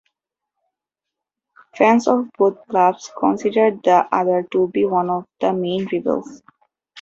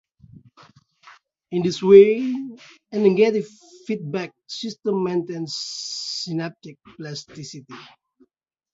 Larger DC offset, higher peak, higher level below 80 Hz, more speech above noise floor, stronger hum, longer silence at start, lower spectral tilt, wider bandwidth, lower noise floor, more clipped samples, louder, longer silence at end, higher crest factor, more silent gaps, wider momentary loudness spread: neither; about the same, -2 dBFS vs 0 dBFS; about the same, -64 dBFS vs -66 dBFS; first, 67 dB vs 48 dB; neither; first, 1.75 s vs 1.05 s; about the same, -6 dB/octave vs -5.5 dB/octave; about the same, 7.8 kHz vs 7.8 kHz; first, -84 dBFS vs -69 dBFS; neither; about the same, -18 LUFS vs -20 LUFS; second, 0 s vs 0.9 s; about the same, 18 dB vs 22 dB; neither; second, 7 LU vs 24 LU